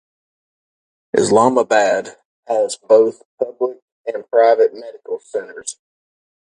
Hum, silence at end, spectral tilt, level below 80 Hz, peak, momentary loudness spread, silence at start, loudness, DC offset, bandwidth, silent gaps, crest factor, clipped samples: none; 0.85 s; -4 dB/octave; -64 dBFS; 0 dBFS; 16 LU; 1.15 s; -16 LUFS; under 0.1%; 11 kHz; 2.25-2.43 s, 3.25-3.38 s, 3.82-4.04 s; 18 dB; under 0.1%